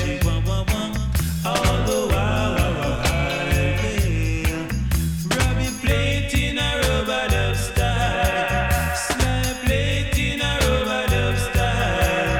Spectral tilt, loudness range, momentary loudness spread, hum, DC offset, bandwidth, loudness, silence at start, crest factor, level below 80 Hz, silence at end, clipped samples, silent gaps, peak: -4.5 dB/octave; 1 LU; 3 LU; none; under 0.1%; 18.5 kHz; -21 LUFS; 0 s; 14 dB; -26 dBFS; 0 s; under 0.1%; none; -6 dBFS